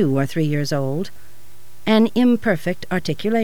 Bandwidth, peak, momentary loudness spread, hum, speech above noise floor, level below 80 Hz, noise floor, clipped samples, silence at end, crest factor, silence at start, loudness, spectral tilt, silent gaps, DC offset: 19 kHz; -4 dBFS; 10 LU; none; 31 dB; -54 dBFS; -50 dBFS; under 0.1%; 0 s; 16 dB; 0 s; -20 LUFS; -6.5 dB/octave; none; 4%